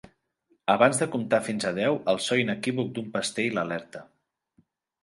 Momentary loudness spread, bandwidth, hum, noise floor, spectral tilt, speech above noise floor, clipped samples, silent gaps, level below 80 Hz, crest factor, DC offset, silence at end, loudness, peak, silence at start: 11 LU; 11.5 kHz; none; -70 dBFS; -4.5 dB/octave; 44 dB; under 0.1%; none; -68 dBFS; 24 dB; under 0.1%; 1 s; -26 LUFS; -4 dBFS; 0.65 s